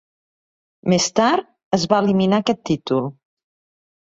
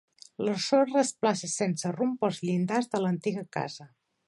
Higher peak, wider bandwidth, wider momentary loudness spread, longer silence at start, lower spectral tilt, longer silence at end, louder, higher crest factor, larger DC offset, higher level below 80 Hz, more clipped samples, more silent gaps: first, -2 dBFS vs -10 dBFS; second, 8 kHz vs 11.5 kHz; second, 7 LU vs 10 LU; first, 0.85 s vs 0.4 s; about the same, -5 dB/octave vs -5 dB/octave; first, 0.95 s vs 0.4 s; first, -19 LUFS vs -29 LUFS; about the same, 18 dB vs 18 dB; neither; first, -56 dBFS vs -76 dBFS; neither; first, 1.64-1.71 s vs none